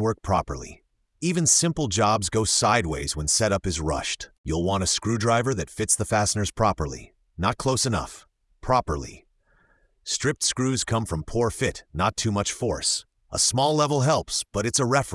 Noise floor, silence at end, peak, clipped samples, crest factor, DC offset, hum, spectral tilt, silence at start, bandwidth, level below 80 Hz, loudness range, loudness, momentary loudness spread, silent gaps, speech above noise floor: -63 dBFS; 0 s; -4 dBFS; under 0.1%; 20 dB; under 0.1%; none; -3.5 dB/octave; 0 s; 12 kHz; -44 dBFS; 5 LU; -24 LUFS; 10 LU; 4.38-4.44 s; 38 dB